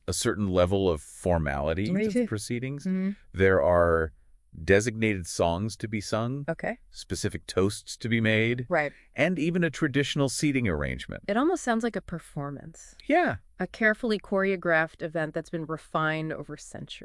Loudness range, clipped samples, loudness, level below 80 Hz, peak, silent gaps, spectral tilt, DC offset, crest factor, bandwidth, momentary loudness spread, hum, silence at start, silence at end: 3 LU; under 0.1%; -27 LUFS; -50 dBFS; -8 dBFS; none; -5.5 dB/octave; under 0.1%; 20 dB; 12 kHz; 12 LU; none; 0.1 s; 0 s